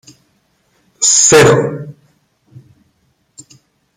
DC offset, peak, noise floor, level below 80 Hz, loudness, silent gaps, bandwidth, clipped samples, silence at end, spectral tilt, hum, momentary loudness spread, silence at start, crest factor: under 0.1%; 0 dBFS; -60 dBFS; -48 dBFS; -9 LUFS; none; 16 kHz; under 0.1%; 2.05 s; -3 dB/octave; none; 22 LU; 1 s; 16 dB